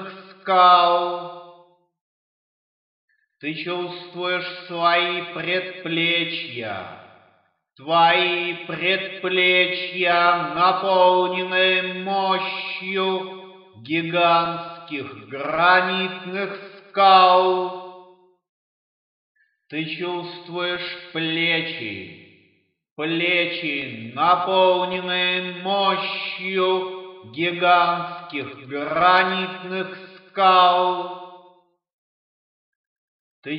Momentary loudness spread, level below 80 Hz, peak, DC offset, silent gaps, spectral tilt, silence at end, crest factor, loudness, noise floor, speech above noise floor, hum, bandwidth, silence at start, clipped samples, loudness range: 16 LU; -72 dBFS; -2 dBFS; under 0.1%; 2.01-3.08 s, 18.49-19.35 s, 22.91-22.96 s, 31.93-33.42 s; -7.5 dB/octave; 0 s; 20 dB; -20 LUFS; -64 dBFS; 43 dB; none; 5.4 kHz; 0 s; under 0.1%; 7 LU